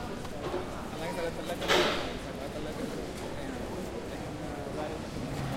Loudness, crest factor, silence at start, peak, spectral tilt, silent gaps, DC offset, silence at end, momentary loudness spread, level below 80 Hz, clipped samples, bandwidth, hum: -34 LUFS; 22 dB; 0 s; -12 dBFS; -4.5 dB/octave; none; under 0.1%; 0 s; 11 LU; -48 dBFS; under 0.1%; 16 kHz; none